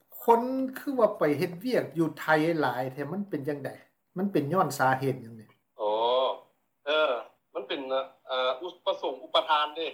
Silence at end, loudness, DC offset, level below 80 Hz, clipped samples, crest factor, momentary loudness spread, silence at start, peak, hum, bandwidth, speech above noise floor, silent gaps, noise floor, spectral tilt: 0 s; -28 LUFS; under 0.1%; -76 dBFS; under 0.1%; 20 dB; 10 LU; 0.1 s; -10 dBFS; none; 18.5 kHz; 28 dB; none; -56 dBFS; -5.5 dB/octave